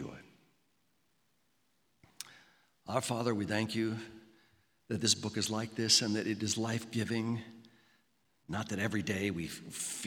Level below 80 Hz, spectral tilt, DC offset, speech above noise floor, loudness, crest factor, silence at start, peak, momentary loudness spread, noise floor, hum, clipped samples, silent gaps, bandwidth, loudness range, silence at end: -72 dBFS; -3.5 dB/octave; under 0.1%; 42 dB; -34 LUFS; 24 dB; 0 s; -14 dBFS; 21 LU; -77 dBFS; none; under 0.1%; none; 19 kHz; 7 LU; 0 s